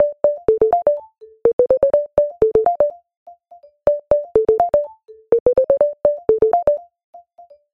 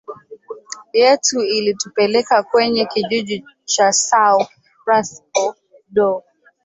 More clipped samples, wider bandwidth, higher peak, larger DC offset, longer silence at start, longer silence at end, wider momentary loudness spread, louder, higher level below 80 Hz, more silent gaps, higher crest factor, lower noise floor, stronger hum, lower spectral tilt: neither; second, 3.8 kHz vs 8.2 kHz; about the same, 0 dBFS vs -2 dBFS; neither; about the same, 0 s vs 0.1 s; about the same, 0.55 s vs 0.45 s; second, 5 LU vs 14 LU; about the same, -17 LUFS vs -17 LUFS; first, -46 dBFS vs -64 dBFS; first, 1.53-1.59 s, 3.17-3.26 s, 5.40-5.46 s, 7.04-7.13 s vs none; about the same, 18 dB vs 16 dB; first, -48 dBFS vs -36 dBFS; neither; first, -9 dB/octave vs -2 dB/octave